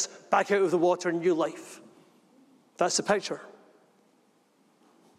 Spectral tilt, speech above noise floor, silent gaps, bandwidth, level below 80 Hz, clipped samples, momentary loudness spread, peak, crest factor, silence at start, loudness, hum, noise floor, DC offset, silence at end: -3.5 dB/octave; 39 dB; none; 13 kHz; -80 dBFS; under 0.1%; 18 LU; -10 dBFS; 20 dB; 0 s; -27 LUFS; none; -66 dBFS; under 0.1%; 1.7 s